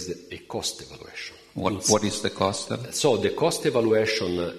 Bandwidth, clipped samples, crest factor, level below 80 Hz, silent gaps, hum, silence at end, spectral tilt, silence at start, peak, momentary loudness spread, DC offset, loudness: 13.5 kHz; under 0.1%; 22 dB; -58 dBFS; none; none; 0 s; -3.5 dB/octave; 0 s; -4 dBFS; 15 LU; under 0.1%; -25 LUFS